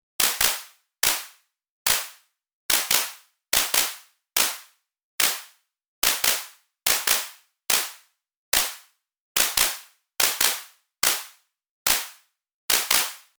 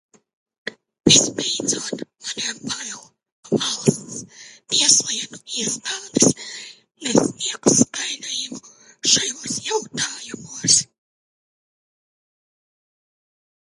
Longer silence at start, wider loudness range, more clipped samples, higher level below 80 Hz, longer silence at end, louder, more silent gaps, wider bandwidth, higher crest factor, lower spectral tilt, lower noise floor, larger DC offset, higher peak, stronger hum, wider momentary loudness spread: second, 0.2 s vs 0.65 s; second, 1 LU vs 5 LU; neither; about the same, -56 dBFS vs -60 dBFS; second, 0.2 s vs 2.85 s; second, -22 LUFS vs -19 LUFS; first, 1.70-1.85 s, 2.53-2.69 s, 5.03-5.18 s, 5.88-6.02 s, 8.37-8.52 s, 9.20-9.35 s, 11.70-11.85 s, 12.54-12.68 s vs 3.32-3.43 s; first, over 20 kHz vs 12 kHz; about the same, 22 dB vs 24 dB; second, 2 dB/octave vs -2 dB/octave; first, -53 dBFS vs -43 dBFS; neither; second, -4 dBFS vs 0 dBFS; neither; about the same, 19 LU vs 20 LU